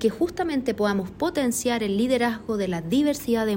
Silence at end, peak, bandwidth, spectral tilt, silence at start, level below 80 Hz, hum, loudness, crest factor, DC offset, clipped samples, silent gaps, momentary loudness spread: 0 s; -10 dBFS; 16.5 kHz; -5 dB/octave; 0 s; -52 dBFS; none; -24 LUFS; 14 dB; under 0.1%; under 0.1%; none; 4 LU